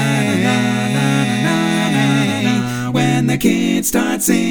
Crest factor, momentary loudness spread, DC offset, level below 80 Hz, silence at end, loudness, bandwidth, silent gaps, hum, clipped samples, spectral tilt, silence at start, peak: 14 dB; 2 LU; under 0.1%; -46 dBFS; 0 s; -15 LUFS; over 20 kHz; none; none; under 0.1%; -5 dB/octave; 0 s; 0 dBFS